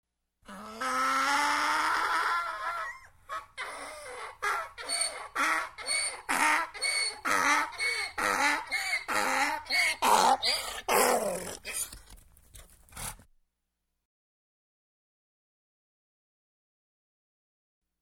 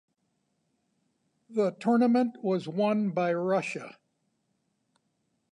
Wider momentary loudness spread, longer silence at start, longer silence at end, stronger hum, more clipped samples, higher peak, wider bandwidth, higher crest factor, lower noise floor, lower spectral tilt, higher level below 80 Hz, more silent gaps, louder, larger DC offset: first, 15 LU vs 12 LU; second, 0.5 s vs 1.5 s; first, 4.85 s vs 1.6 s; neither; neither; first, -10 dBFS vs -14 dBFS; first, 16.5 kHz vs 10.5 kHz; first, 22 dB vs 16 dB; first, -83 dBFS vs -77 dBFS; second, -0.5 dB/octave vs -7 dB/octave; first, -62 dBFS vs -82 dBFS; neither; about the same, -28 LUFS vs -28 LUFS; neither